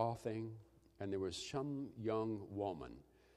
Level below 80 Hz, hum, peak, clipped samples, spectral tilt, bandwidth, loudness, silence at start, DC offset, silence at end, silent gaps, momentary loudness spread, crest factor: -70 dBFS; none; -24 dBFS; under 0.1%; -6 dB/octave; 13 kHz; -44 LUFS; 0 s; under 0.1%; 0.35 s; none; 11 LU; 20 dB